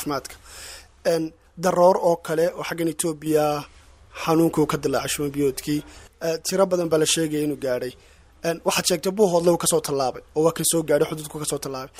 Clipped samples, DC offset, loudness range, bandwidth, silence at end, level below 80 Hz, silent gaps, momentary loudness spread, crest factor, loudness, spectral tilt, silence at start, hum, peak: under 0.1%; under 0.1%; 2 LU; 16 kHz; 0 s; -52 dBFS; none; 11 LU; 18 dB; -22 LUFS; -4 dB/octave; 0 s; none; -4 dBFS